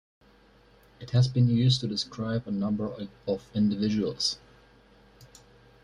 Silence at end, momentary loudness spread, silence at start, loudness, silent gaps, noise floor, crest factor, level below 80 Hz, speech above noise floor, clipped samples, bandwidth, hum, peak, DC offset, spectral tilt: 0.6 s; 11 LU; 1 s; -27 LUFS; none; -58 dBFS; 18 dB; -58 dBFS; 32 dB; under 0.1%; 11 kHz; none; -12 dBFS; under 0.1%; -6.5 dB/octave